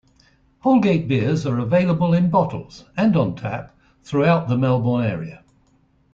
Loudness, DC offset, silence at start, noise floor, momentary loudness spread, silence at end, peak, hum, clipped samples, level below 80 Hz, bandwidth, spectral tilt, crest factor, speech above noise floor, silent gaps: -20 LUFS; under 0.1%; 0.65 s; -59 dBFS; 12 LU; 0.75 s; -4 dBFS; none; under 0.1%; -52 dBFS; 7.6 kHz; -8.5 dB/octave; 16 dB; 40 dB; none